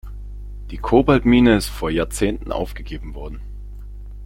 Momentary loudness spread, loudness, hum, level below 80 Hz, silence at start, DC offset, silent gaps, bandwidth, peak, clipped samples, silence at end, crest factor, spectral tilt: 23 LU; -18 LUFS; 50 Hz at -30 dBFS; -30 dBFS; 0.05 s; under 0.1%; none; 16.5 kHz; -2 dBFS; under 0.1%; 0 s; 18 dB; -6 dB/octave